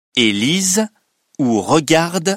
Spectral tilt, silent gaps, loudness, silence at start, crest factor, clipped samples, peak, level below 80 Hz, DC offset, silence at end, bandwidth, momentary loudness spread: -3.5 dB/octave; none; -15 LUFS; 0.15 s; 16 dB; under 0.1%; 0 dBFS; -56 dBFS; under 0.1%; 0 s; 16 kHz; 6 LU